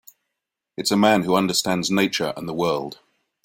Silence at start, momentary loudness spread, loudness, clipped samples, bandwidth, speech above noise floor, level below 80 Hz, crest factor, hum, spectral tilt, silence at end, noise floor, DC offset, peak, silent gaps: 0.8 s; 10 LU; -21 LUFS; under 0.1%; 16.5 kHz; 61 dB; -60 dBFS; 20 dB; none; -4 dB/octave; 0.5 s; -82 dBFS; under 0.1%; -4 dBFS; none